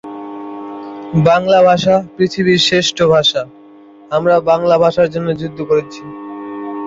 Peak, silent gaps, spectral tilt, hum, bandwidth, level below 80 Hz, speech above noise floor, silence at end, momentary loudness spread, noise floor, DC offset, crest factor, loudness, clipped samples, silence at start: -2 dBFS; none; -5 dB/octave; none; 7.8 kHz; -48 dBFS; 28 dB; 0 s; 18 LU; -40 dBFS; under 0.1%; 12 dB; -13 LUFS; under 0.1%; 0.05 s